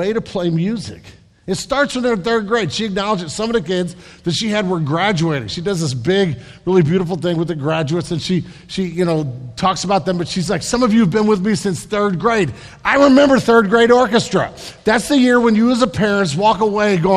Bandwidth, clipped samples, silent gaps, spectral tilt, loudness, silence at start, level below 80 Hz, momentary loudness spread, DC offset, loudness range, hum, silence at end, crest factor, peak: 13.5 kHz; under 0.1%; none; -5.5 dB/octave; -16 LUFS; 0 s; -44 dBFS; 10 LU; under 0.1%; 6 LU; none; 0 s; 16 dB; 0 dBFS